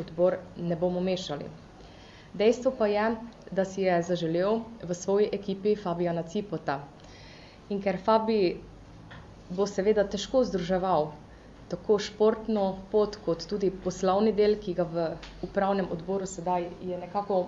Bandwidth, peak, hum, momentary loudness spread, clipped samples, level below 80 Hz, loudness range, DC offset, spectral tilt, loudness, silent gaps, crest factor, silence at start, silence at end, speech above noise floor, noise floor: 8 kHz; -10 dBFS; none; 14 LU; under 0.1%; -54 dBFS; 3 LU; under 0.1%; -6 dB/octave; -28 LUFS; none; 18 dB; 0 s; 0 s; 22 dB; -49 dBFS